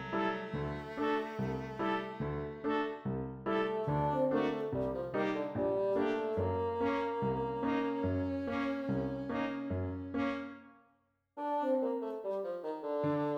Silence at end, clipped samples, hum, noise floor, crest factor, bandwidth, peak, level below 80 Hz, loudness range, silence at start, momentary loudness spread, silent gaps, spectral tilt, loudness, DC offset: 0 s; under 0.1%; none; -74 dBFS; 16 dB; 7.6 kHz; -20 dBFS; -58 dBFS; 4 LU; 0 s; 6 LU; none; -8 dB/octave; -35 LUFS; under 0.1%